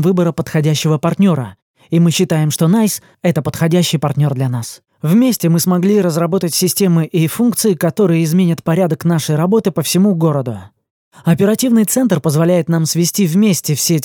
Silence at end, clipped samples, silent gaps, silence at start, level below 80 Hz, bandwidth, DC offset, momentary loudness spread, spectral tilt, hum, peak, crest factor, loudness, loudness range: 0 s; under 0.1%; 1.62-1.74 s, 10.90-11.11 s; 0 s; -56 dBFS; 20 kHz; under 0.1%; 5 LU; -5.5 dB/octave; none; -2 dBFS; 12 dB; -14 LUFS; 1 LU